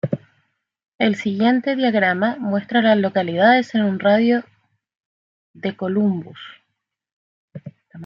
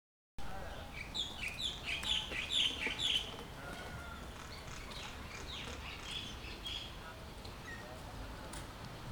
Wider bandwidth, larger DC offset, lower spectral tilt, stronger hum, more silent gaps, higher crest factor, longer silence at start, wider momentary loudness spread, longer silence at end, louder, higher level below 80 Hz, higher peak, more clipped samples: second, 7.4 kHz vs over 20 kHz; neither; first, -7 dB/octave vs -2.5 dB/octave; neither; first, 0.88-0.99 s, 5.00-5.54 s, 7.13-7.48 s vs none; about the same, 18 dB vs 20 dB; second, 0.05 s vs 0.4 s; first, 19 LU vs 15 LU; about the same, 0 s vs 0 s; first, -19 LUFS vs -40 LUFS; second, -68 dBFS vs -54 dBFS; first, -2 dBFS vs -22 dBFS; neither